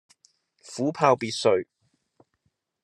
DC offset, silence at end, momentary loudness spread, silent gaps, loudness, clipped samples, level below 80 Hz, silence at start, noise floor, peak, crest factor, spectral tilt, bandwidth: under 0.1%; 1.2 s; 16 LU; none; -24 LUFS; under 0.1%; -76 dBFS; 0.65 s; -75 dBFS; -4 dBFS; 24 dB; -4.5 dB/octave; 12 kHz